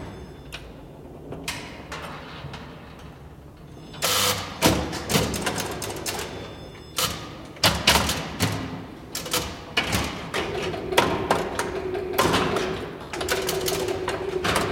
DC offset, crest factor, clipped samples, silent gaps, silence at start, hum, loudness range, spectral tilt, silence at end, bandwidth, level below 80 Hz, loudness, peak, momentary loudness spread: under 0.1%; 24 dB; under 0.1%; none; 0 s; none; 8 LU; -3 dB/octave; 0 s; 17 kHz; -44 dBFS; -25 LUFS; -2 dBFS; 20 LU